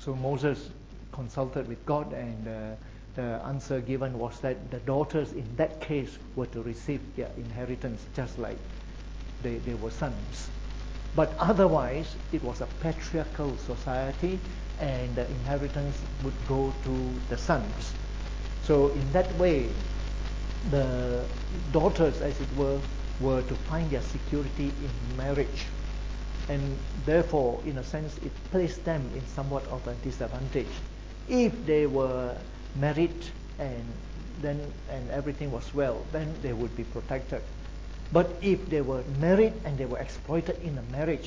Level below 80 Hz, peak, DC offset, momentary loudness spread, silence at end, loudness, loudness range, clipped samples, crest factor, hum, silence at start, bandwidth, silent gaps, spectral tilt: -36 dBFS; -8 dBFS; under 0.1%; 12 LU; 0 s; -31 LUFS; 6 LU; under 0.1%; 20 dB; none; 0 s; 7.8 kHz; none; -7 dB/octave